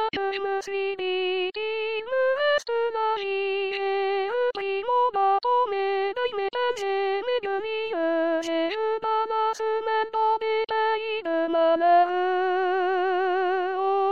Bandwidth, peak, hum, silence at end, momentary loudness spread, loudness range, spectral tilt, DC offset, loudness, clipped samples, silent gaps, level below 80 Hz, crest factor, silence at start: 8.6 kHz; -10 dBFS; none; 0 s; 5 LU; 3 LU; -3 dB/octave; 0.3%; -25 LUFS; under 0.1%; none; -68 dBFS; 16 dB; 0 s